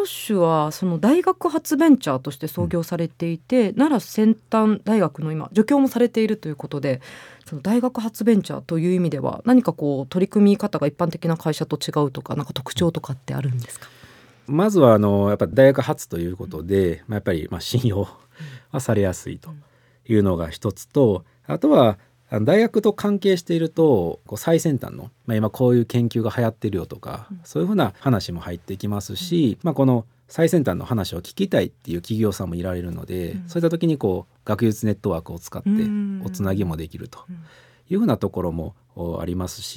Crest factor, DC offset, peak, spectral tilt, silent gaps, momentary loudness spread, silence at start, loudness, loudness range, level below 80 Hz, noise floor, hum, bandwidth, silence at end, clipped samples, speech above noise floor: 20 dB; under 0.1%; 0 dBFS; -7 dB/octave; none; 13 LU; 0 s; -21 LUFS; 6 LU; -54 dBFS; -49 dBFS; none; 18.5 kHz; 0 s; under 0.1%; 28 dB